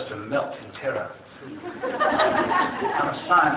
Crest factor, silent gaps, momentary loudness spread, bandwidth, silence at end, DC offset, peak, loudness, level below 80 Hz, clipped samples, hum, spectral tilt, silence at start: 18 dB; none; 17 LU; 4 kHz; 0 s; under 0.1%; -8 dBFS; -24 LUFS; -58 dBFS; under 0.1%; none; -8.5 dB/octave; 0 s